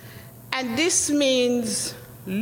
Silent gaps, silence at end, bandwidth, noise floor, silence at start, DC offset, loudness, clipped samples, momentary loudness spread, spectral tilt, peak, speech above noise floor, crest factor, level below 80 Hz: none; 0 s; 17 kHz; -43 dBFS; 0 s; under 0.1%; -22 LUFS; under 0.1%; 19 LU; -2.5 dB/octave; -4 dBFS; 20 dB; 22 dB; -58 dBFS